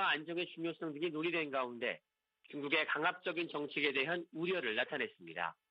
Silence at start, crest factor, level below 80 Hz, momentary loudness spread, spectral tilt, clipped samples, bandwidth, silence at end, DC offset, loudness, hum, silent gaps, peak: 0 s; 20 dB; -88 dBFS; 8 LU; -6.5 dB/octave; under 0.1%; 5.6 kHz; 0.2 s; under 0.1%; -37 LUFS; none; none; -18 dBFS